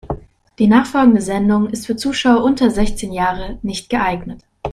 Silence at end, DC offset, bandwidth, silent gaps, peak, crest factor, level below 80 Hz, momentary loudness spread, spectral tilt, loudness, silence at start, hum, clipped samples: 0 s; under 0.1%; 14 kHz; none; 0 dBFS; 16 dB; -34 dBFS; 14 LU; -5.5 dB/octave; -16 LUFS; 0.05 s; none; under 0.1%